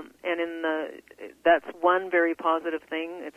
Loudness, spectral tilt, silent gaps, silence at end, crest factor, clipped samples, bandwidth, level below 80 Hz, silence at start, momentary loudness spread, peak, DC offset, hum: -26 LUFS; -5 dB/octave; none; 0.05 s; 20 dB; under 0.1%; 14 kHz; -72 dBFS; 0 s; 11 LU; -8 dBFS; under 0.1%; none